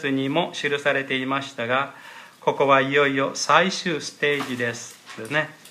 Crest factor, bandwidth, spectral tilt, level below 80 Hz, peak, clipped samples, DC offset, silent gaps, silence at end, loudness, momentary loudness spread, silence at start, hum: 22 dB; 15 kHz; -4 dB/octave; -74 dBFS; -2 dBFS; under 0.1%; under 0.1%; none; 0 s; -22 LUFS; 12 LU; 0 s; none